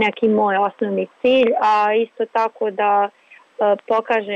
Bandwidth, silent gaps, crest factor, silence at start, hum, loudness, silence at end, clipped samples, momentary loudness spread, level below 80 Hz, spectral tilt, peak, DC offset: 7.8 kHz; none; 10 dB; 0 s; none; -18 LUFS; 0 s; under 0.1%; 6 LU; -68 dBFS; -6 dB/octave; -8 dBFS; under 0.1%